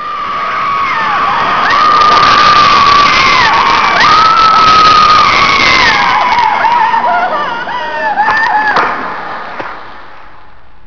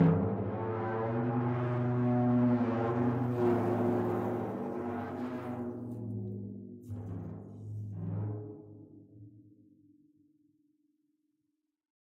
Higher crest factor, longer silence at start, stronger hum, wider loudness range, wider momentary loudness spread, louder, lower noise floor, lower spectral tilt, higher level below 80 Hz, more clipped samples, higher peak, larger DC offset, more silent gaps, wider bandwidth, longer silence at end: second, 8 dB vs 20 dB; about the same, 0 s vs 0 s; neither; second, 8 LU vs 14 LU; second, 12 LU vs 16 LU; first, -7 LUFS vs -33 LUFS; second, -39 dBFS vs -83 dBFS; second, -2.5 dB/octave vs -10.5 dB/octave; first, -36 dBFS vs -66 dBFS; neither; first, 0 dBFS vs -14 dBFS; first, 4% vs under 0.1%; neither; about the same, 5.4 kHz vs 5.4 kHz; second, 0.7 s vs 2.65 s